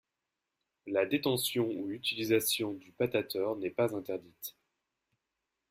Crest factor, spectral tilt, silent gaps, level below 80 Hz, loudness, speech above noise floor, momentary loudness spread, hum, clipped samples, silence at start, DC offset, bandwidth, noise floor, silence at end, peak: 20 dB; -4 dB/octave; none; -72 dBFS; -33 LUFS; 55 dB; 12 LU; none; under 0.1%; 0.85 s; under 0.1%; 16 kHz; -88 dBFS; 1.2 s; -16 dBFS